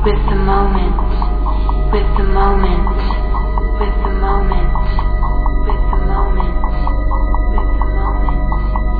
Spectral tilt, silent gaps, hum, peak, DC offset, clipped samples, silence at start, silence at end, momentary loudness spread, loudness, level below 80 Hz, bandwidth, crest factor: -10.5 dB/octave; none; none; 0 dBFS; 0.2%; under 0.1%; 0 s; 0 s; 4 LU; -17 LUFS; -14 dBFS; 4.8 kHz; 12 dB